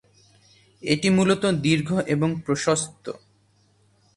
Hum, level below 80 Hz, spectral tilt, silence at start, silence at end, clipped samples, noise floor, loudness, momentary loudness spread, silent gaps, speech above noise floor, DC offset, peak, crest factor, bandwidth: none; -58 dBFS; -5 dB/octave; 0.85 s; 1 s; under 0.1%; -62 dBFS; -22 LUFS; 17 LU; none; 40 dB; under 0.1%; -6 dBFS; 18 dB; 11.5 kHz